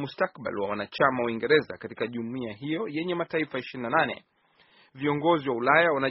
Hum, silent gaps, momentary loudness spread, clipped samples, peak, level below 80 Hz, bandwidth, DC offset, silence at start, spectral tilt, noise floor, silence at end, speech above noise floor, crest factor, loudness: none; none; 12 LU; under 0.1%; -6 dBFS; -68 dBFS; 5.8 kHz; under 0.1%; 0 s; -3.5 dB/octave; -61 dBFS; 0 s; 35 dB; 22 dB; -27 LUFS